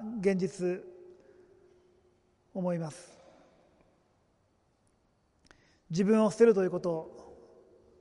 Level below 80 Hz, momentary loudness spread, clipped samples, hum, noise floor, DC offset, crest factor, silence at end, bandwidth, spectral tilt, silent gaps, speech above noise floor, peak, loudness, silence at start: -70 dBFS; 24 LU; under 0.1%; none; -71 dBFS; under 0.1%; 22 dB; 0.65 s; 11.5 kHz; -7 dB/octave; none; 43 dB; -10 dBFS; -29 LUFS; 0 s